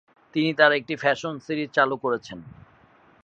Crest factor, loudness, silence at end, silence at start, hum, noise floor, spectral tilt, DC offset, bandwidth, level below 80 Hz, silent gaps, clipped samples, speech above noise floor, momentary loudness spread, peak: 22 dB; -23 LUFS; 0.75 s; 0.35 s; none; -56 dBFS; -5.5 dB/octave; under 0.1%; 7.8 kHz; -66 dBFS; none; under 0.1%; 33 dB; 12 LU; -2 dBFS